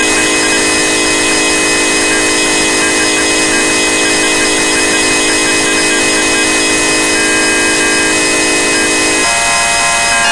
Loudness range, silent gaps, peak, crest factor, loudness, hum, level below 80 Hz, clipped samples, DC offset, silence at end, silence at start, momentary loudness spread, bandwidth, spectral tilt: 0 LU; none; 0 dBFS; 10 dB; -9 LUFS; none; -36 dBFS; under 0.1%; under 0.1%; 0 s; 0 s; 0 LU; 12 kHz; -1 dB/octave